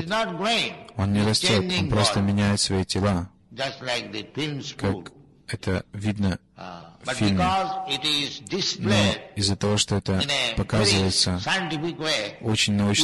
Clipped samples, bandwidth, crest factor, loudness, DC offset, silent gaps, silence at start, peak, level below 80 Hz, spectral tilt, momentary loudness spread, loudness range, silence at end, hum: under 0.1%; 12 kHz; 18 dB; -24 LUFS; under 0.1%; none; 0 s; -6 dBFS; -42 dBFS; -4 dB/octave; 10 LU; 7 LU; 0 s; none